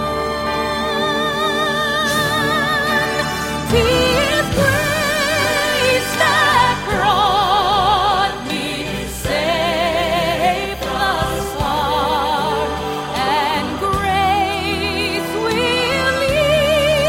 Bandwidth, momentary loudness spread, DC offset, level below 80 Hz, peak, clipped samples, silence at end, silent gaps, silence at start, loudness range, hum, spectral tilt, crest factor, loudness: 16.5 kHz; 6 LU; under 0.1%; -34 dBFS; -2 dBFS; under 0.1%; 0 s; none; 0 s; 4 LU; none; -3.5 dB/octave; 16 dB; -17 LUFS